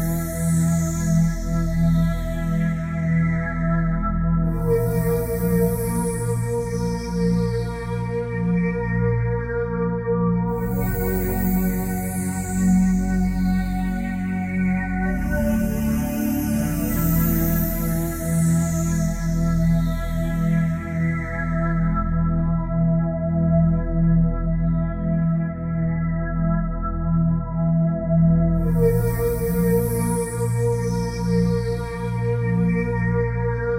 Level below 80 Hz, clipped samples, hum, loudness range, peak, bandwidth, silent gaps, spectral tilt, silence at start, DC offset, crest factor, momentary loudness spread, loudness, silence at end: -30 dBFS; under 0.1%; none; 2 LU; -6 dBFS; 16 kHz; none; -7.5 dB/octave; 0 s; under 0.1%; 14 dB; 5 LU; -22 LUFS; 0 s